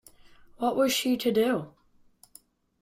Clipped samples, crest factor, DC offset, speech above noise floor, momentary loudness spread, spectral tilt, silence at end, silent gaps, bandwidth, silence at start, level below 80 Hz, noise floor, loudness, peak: under 0.1%; 16 dB; under 0.1%; 34 dB; 8 LU; -3.5 dB/octave; 1.15 s; none; 16 kHz; 0.6 s; -66 dBFS; -60 dBFS; -26 LUFS; -14 dBFS